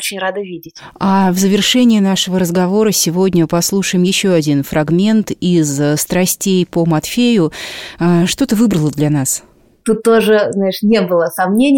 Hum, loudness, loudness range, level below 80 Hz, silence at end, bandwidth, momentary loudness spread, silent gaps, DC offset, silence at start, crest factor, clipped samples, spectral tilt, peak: none; -13 LUFS; 2 LU; -46 dBFS; 0 s; 17 kHz; 7 LU; none; under 0.1%; 0 s; 12 dB; under 0.1%; -5 dB/octave; -2 dBFS